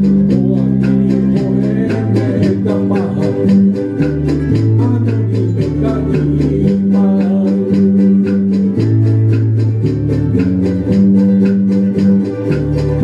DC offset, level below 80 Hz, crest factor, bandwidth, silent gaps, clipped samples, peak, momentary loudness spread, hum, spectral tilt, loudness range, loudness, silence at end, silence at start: under 0.1%; -32 dBFS; 10 dB; 7 kHz; none; under 0.1%; -2 dBFS; 4 LU; none; -10 dB/octave; 1 LU; -13 LUFS; 0 s; 0 s